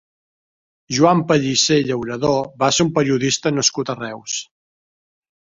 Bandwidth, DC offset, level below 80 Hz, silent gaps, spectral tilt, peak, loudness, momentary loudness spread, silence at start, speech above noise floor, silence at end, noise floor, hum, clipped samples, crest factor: 7.8 kHz; under 0.1%; -54 dBFS; none; -4 dB/octave; -2 dBFS; -18 LUFS; 10 LU; 0.9 s; over 72 dB; 1.05 s; under -90 dBFS; none; under 0.1%; 18 dB